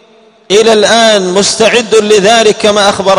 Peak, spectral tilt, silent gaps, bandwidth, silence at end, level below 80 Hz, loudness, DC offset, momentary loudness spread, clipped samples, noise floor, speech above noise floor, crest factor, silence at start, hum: 0 dBFS; -2.5 dB/octave; none; 12.5 kHz; 0 s; -46 dBFS; -6 LUFS; under 0.1%; 3 LU; 2%; -42 dBFS; 36 dB; 8 dB; 0.5 s; none